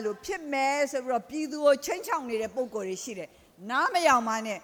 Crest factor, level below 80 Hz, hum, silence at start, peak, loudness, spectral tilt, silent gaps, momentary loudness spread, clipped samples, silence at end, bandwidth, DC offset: 20 dB; -66 dBFS; none; 0 s; -10 dBFS; -28 LUFS; -2.5 dB/octave; none; 13 LU; under 0.1%; 0.05 s; over 20 kHz; under 0.1%